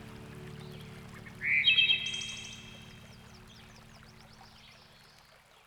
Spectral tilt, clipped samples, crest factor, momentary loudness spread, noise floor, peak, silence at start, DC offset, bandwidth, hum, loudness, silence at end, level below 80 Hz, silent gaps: -1.5 dB/octave; under 0.1%; 24 dB; 29 LU; -60 dBFS; -12 dBFS; 0 s; under 0.1%; over 20 kHz; none; -27 LUFS; 1.2 s; -62 dBFS; none